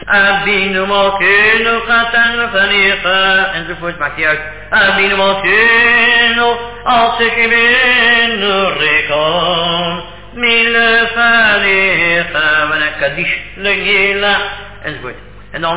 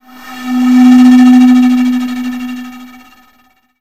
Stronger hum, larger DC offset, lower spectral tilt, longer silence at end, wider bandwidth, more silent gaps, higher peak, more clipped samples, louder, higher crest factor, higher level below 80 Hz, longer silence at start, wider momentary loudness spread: neither; first, 2% vs 0.8%; first, -6.5 dB/octave vs -4 dB/octave; second, 0 s vs 0.95 s; second, 4 kHz vs 14 kHz; neither; about the same, 0 dBFS vs 0 dBFS; second, under 0.1% vs 1%; second, -10 LUFS vs -7 LUFS; about the same, 12 dB vs 8 dB; first, -38 dBFS vs -50 dBFS; second, 0 s vs 0.25 s; second, 11 LU vs 21 LU